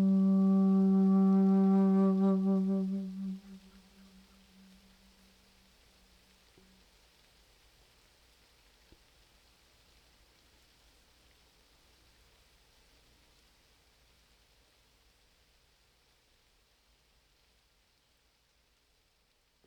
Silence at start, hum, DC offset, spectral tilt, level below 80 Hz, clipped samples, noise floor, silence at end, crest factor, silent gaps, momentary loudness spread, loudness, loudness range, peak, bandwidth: 0 s; none; under 0.1%; -10 dB/octave; -70 dBFS; under 0.1%; -73 dBFS; 16.1 s; 16 dB; none; 16 LU; -28 LUFS; 20 LU; -18 dBFS; 5.6 kHz